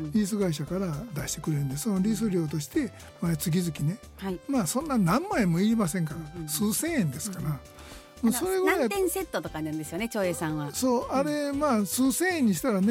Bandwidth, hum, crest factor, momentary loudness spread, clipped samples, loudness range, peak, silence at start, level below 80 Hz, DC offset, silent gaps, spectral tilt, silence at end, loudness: 16.5 kHz; none; 16 dB; 9 LU; under 0.1%; 2 LU; -12 dBFS; 0 s; -52 dBFS; under 0.1%; none; -5.5 dB/octave; 0 s; -28 LUFS